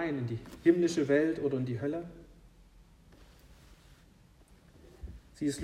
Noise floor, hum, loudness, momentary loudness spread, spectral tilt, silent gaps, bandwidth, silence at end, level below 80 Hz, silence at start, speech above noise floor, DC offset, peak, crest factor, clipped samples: -60 dBFS; none; -31 LUFS; 23 LU; -6.5 dB/octave; none; 13 kHz; 0 s; -58 dBFS; 0 s; 30 dB; under 0.1%; -12 dBFS; 22 dB; under 0.1%